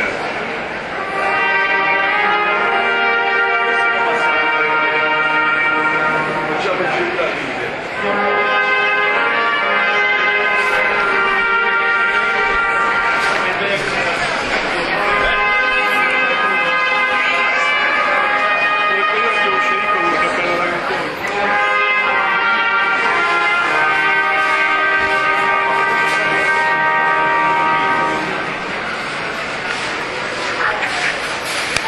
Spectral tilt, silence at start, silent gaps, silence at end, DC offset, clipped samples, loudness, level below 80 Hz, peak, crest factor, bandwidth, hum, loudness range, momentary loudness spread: -3 dB/octave; 0 s; none; 0 s; under 0.1%; under 0.1%; -15 LUFS; -46 dBFS; 0 dBFS; 16 dB; 12.5 kHz; none; 3 LU; 6 LU